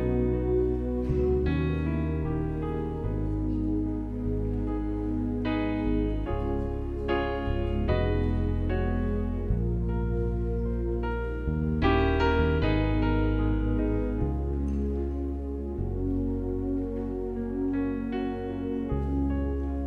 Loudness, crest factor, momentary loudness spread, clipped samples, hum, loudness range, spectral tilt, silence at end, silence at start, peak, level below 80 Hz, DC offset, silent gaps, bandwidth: -29 LUFS; 16 dB; 6 LU; under 0.1%; none; 4 LU; -9.5 dB/octave; 0 s; 0 s; -12 dBFS; -32 dBFS; under 0.1%; none; 5.2 kHz